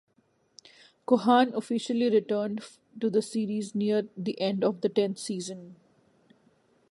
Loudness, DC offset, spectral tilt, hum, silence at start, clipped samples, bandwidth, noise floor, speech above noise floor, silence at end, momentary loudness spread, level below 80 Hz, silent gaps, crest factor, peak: -28 LUFS; under 0.1%; -5.5 dB/octave; none; 1.1 s; under 0.1%; 11.5 kHz; -69 dBFS; 42 dB; 1.15 s; 13 LU; -80 dBFS; none; 20 dB; -8 dBFS